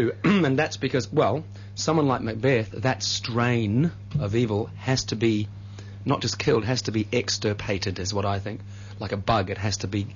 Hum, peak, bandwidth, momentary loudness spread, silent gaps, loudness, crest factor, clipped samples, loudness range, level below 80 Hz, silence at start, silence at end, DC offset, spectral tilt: none; -8 dBFS; 7.4 kHz; 9 LU; none; -25 LUFS; 16 dB; under 0.1%; 2 LU; -50 dBFS; 0 s; 0 s; under 0.1%; -5 dB/octave